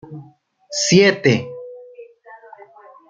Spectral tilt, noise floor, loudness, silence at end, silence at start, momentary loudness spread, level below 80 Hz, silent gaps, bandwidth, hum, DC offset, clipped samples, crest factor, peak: -4 dB/octave; -49 dBFS; -16 LUFS; 1.05 s; 0.1 s; 26 LU; -60 dBFS; none; 9.4 kHz; none; under 0.1%; under 0.1%; 20 dB; -2 dBFS